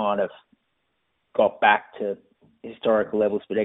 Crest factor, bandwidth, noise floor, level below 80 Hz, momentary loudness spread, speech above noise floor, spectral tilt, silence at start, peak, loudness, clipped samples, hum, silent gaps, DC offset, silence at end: 22 dB; 3.9 kHz; -74 dBFS; -66 dBFS; 15 LU; 51 dB; -2.5 dB/octave; 0 s; -2 dBFS; -23 LUFS; under 0.1%; none; none; under 0.1%; 0 s